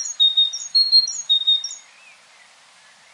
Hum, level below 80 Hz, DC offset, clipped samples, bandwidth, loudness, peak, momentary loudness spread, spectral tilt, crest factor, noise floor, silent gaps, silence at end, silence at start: none; under -90 dBFS; under 0.1%; under 0.1%; 11.5 kHz; -15 LUFS; -6 dBFS; 10 LU; 5.5 dB/octave; 16 dB; -51 dBFS; none; 1.35 s; 0 s